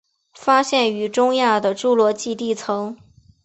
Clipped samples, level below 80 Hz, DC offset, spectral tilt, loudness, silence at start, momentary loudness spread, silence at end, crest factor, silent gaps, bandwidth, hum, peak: under 0.1%; -64 dBFS; under 0.1%; -3.5 dB/octave; -19 LUFS; 0.4 s; 9 LU; 0.5 s; 18 dB; none; 8.4 kHz; none; -2 dBFS